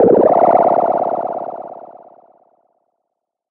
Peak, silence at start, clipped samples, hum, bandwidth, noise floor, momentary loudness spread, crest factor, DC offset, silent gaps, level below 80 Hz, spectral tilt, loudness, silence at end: -2 dBFS; 0 s; under 0.1%; none; 3.8 kHz; -77 dBFS; 21 LU; 14 dB; under 0.1%; none; -60 dBFS; -11 dB/octave; -14 LUFS; 1.7 s